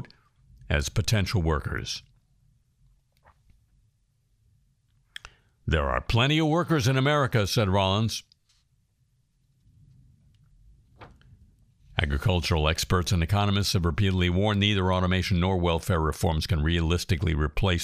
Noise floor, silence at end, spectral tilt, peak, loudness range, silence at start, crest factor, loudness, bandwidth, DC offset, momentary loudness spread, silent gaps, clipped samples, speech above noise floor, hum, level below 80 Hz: -69 dBFS; 0 s; -5.5 dB/octave; -6 dBFS; 11 LU; 0 s; 22 dB; -25 LUFS; 15.5 kHz; under 0.1%; 9 LU; none; under 0.1%; 44 dB; none; -38 dBFS